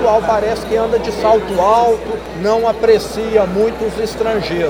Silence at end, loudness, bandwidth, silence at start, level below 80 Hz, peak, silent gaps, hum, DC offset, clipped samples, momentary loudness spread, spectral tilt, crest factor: 0 s; -15 LUFS; over 20 kHz; 0 s; -36 dBFS; 0 dBFS; none; none; under 0.1%; under 0.1%; 7 LU; -5.5 dB/octave; 14 dB